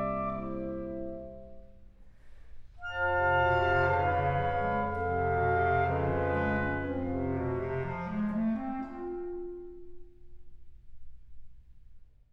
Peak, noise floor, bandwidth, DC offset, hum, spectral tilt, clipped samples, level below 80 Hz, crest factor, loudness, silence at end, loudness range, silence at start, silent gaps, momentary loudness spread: -14 dBFS; -52 dBFS; 6 kHz; under 0.1%; none; -9 dB/octave; under 0.1%; -50 dBFS; 18 dB; -31 LUFS; 0.3 s; 11 LU; 0 s; none; 15 LU